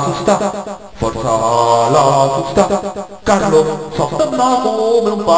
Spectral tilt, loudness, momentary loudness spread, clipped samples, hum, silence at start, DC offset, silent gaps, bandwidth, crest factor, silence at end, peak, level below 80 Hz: -5 dB/octave; -14 LUFS; 10 LU; under 0.1%; none; 0 s; 0.7%; none; 8 kHz; 14 dB; 0 s; 0 dBFS; -40 dBFS